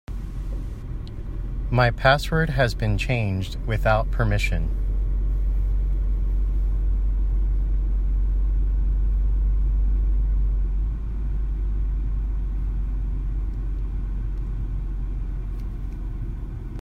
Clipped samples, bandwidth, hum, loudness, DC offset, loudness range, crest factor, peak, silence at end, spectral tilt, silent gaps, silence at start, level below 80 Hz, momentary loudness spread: under 0.1%; 8 kHz; none; -26 LUFS; under 0.1%; 7 LU; 18 dB; -4 dBFS; 0 s; -6.5 dB/octave; none; 0.1 s; -24 dBFS; 11 LU